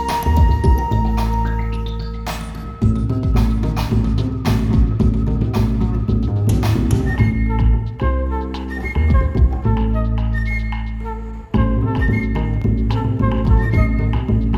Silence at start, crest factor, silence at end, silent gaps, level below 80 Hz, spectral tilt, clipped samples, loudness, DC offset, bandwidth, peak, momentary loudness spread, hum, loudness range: 0 s; 14 dB; 0 s; none; -20 dBFS; -8 dB/octave; under 0.1%; -19 LUFS; under 0.1%; 14 kHz; -2 dBFS; 9 LU; none; 2 LU